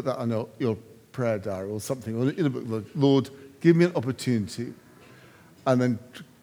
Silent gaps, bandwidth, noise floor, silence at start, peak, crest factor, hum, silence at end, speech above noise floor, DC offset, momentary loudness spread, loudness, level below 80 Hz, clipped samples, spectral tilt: none; over 20 kHz; -52 dBFS; 0 s; -6 dBFS; 20 dB; none; 0.2 s; 27 dB; under 0.1%; 13 LU; -26 LUFS; -72 dBFS; under 0.1%; -7 dB/octave